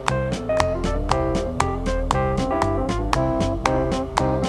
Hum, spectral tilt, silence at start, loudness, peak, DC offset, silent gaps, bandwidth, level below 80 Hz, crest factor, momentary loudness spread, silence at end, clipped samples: none; -6 dB/octave; 0 s; -23 LUFS; 0 dBFS; 0.1%; none; 13 kHz; -30 dBFS; 20 dB; 2 LU; 0 s; under 0.1%